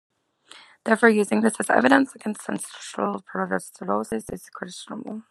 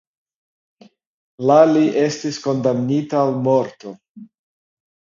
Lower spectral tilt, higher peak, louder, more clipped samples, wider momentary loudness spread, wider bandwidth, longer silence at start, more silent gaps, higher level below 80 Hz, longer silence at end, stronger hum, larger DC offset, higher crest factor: second, -4.5 dB/octave vs -6.5 dB/octave; about the same, -2 dBFS vs 0 dBFS; second, -23 LUFS vs -17 LUFS; neither; first, 17 LU vs 13 LU; first, 13 kHz vs 7.6 kHz; second, 0.55 s vs 1.4 s; second, none vs 4.09-4.15 s; about the same, -66 dBFS vs -66 dBFS; second, 0.1 s vs 0.8 s; neither; neither; about the same, 22 dB vs 18 dB